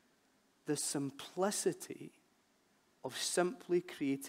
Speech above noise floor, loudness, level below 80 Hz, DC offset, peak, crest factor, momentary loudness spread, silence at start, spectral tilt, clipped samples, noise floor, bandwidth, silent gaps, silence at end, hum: 36 dB; -37 LUFS; -88 dBFS; under 0.1%; -20 dBFS; 20 dB; 15 LU; 0.65 s; -3.5 dB/octave; under 0.1%; -73 dBFS; 16 kHz; none; 0 s; none